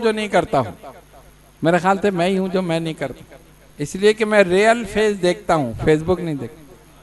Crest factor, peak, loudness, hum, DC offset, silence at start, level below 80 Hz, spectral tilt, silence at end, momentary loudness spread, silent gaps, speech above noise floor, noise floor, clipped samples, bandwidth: 20 dB; 0 dBFS; -19 LUFS; none; under 0.1%; 0 s; -44 dBFS; -5.5 dB/octave; 0.3 s; 14 LU; none; 28 dB; -47 dBFS; under 0.1%; 12 kHz